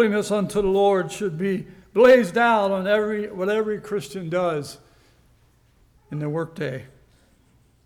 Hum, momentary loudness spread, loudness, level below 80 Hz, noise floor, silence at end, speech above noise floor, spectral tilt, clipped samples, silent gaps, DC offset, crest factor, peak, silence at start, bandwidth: none; 15 LU; -22 LUFS; -54 dBFS; -59 dBFS; 1 s; 38 dB; -6 dB/octave; under 0.1%; none; under 0.1%; 16 dB; -6 dBFS; 0 s; 15 kHz